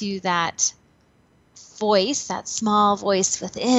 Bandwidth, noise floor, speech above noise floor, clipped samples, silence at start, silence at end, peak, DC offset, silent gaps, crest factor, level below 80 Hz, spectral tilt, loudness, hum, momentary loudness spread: 8.6 kHz; -59 dBFS; 38 dB; under 0.1%; 0 s; 0 s; -6 dBFS; under 0.1%; none; 18 dB; -62 dBFS; -3 dB/octave; -21 LUFS; none; 7 LU